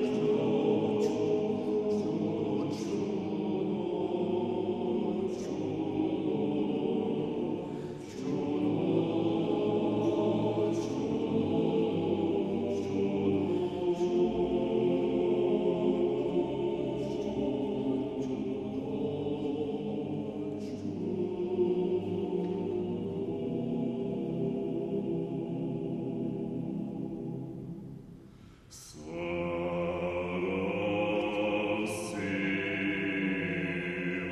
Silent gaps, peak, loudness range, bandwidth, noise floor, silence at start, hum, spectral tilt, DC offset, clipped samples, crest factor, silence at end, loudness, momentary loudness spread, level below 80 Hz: none; -16 dBFS; 6 LU; 12 kHz; -53 dBFS; 0 s; none; -7 dB/octave; under 0.1%; under 0.1%; 16 dB; 0 s; -32 LUFS; 7 LU; -60 dBFS